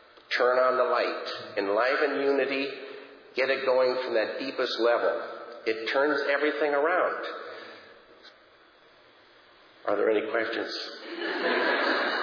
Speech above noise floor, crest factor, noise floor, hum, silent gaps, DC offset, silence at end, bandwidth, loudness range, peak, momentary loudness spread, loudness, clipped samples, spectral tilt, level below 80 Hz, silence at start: 31 dB; 16 dB; -57 dBFS; none; none; under 0.1%; 0 s; 5.4 kHz; 6 LU; -12 dBFS; 12 LU; -27 LUFS; under 0.1%; -4 dB/octave; -84 dBFS; 0.3 s